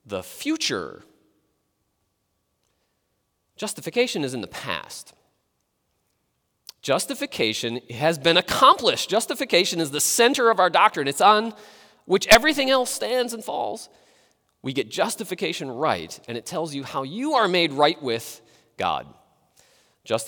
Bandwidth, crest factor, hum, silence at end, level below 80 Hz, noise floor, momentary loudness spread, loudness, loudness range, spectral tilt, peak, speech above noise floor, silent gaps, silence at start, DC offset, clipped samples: over 20 kHz; 22 dB; none; 0 s; -54 dBFS; -74 dBFS; 15 LU; -22 LUFS; 12 LU; -2.5 dB/octave; -2 dBFS; 51 dB; none; 0.05 s; under 0.1%; under 0.1%